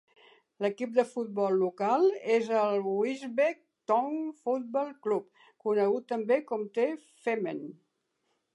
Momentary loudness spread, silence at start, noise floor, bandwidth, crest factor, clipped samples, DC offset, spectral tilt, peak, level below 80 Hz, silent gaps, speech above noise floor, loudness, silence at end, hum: 8 LU; 0.6 s; -78 dBFS; 11 kHz; 18 dB; under 0.1%; under 0.1%; -6.5 dB/octave; -12 dBFS; -88 dBFS; none; 49 dB; -30 LUFS; 0.85 s; none